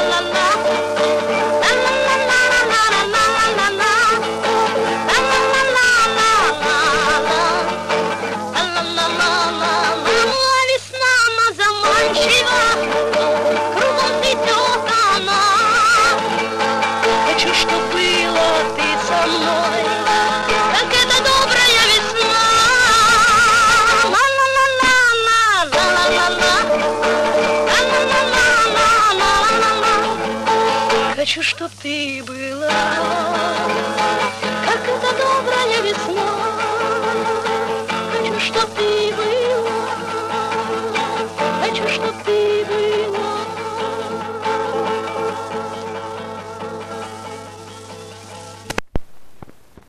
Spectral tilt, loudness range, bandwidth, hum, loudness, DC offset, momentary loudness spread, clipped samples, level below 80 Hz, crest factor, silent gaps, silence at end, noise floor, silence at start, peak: -2 dB/octave; 9 LU; 14 kHz; none; -15 LUFS; under 0.1%; 11 LU; under 0.1%; -44 dBFS; 12 dB; none; 0.3 s; -42 dBFS; 0 s; -4 dBFS